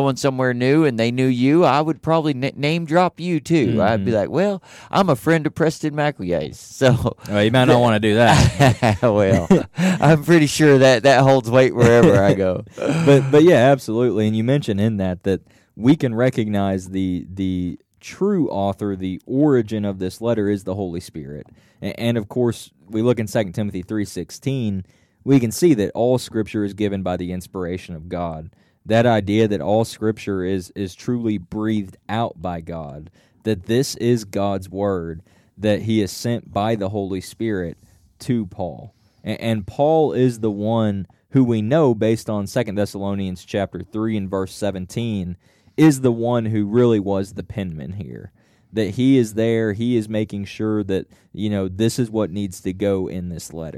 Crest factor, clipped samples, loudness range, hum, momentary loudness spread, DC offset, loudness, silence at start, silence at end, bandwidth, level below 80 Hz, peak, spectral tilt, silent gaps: 14 dB; under 0.1%; 9 LU; none; 14 LU; under 0.1%; -19 LUFS; 0 s; 0 s; 15.5 kHz; -46 dBFS; -4 dBFS; -6.5 dB/octave; none